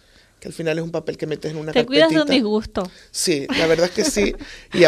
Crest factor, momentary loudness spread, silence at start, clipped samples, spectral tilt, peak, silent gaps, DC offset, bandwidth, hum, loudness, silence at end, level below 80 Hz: 20 dB; 13 LU; 0.4 s; under 0.1%; -4 dB/octave; 0 dBFS; none; under 0.1%; 15 kHz; none; -20 LUFS; 0 s; -44 dBFS